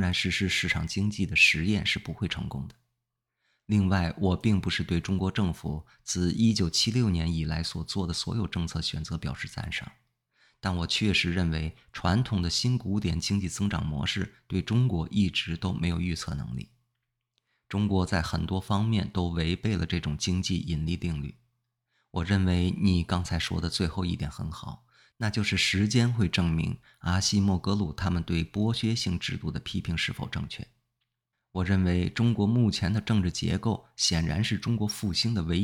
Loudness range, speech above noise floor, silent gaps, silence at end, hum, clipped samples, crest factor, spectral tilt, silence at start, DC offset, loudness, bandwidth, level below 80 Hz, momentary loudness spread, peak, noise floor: 4 LU; 56 dB; none; 0 s; none; under 0.1%; 20 dB; -5 dB/octave; 0 s; under 0.1%; -28 LUFS; 15 kHz; -48 dBFS; 10 LU; -8 dBFS; -83 dBFS